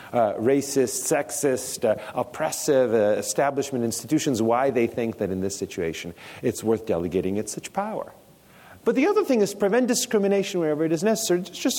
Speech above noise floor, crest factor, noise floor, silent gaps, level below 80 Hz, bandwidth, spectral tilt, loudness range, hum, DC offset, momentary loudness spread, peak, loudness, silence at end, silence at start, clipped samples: 28 dB; 14 dB; -51 dBFS; none; -60 dBFS; 17 kHz; -4.5 dB/octave; 5 LU; none; under 0.1%; 8 LU; -10 dBFS; -24 LUFS; 0 s; 0 s; under 0.1%